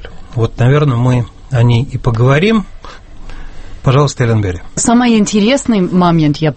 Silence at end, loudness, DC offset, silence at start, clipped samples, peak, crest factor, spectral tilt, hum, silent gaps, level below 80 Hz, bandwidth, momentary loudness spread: 0 s; -12 LUFS; under 0.1%; 0 s; under 0.1%; 0 dBFS; 12 dB; -6 dB/octave; none; none; -30 dBFS; 8.8 kHz; 8 LU